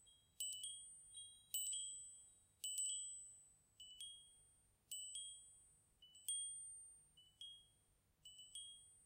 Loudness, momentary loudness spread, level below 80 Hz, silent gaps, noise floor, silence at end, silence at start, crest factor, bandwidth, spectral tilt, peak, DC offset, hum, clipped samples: -49 LUFS; 22 LU; -84 dBFS; none; -79 dBFS; 0 s; 0 s; 28 dB; 16 kHz; 2.5 dB/octave; -26 dBFS; under 0.1%; none; under 0.1%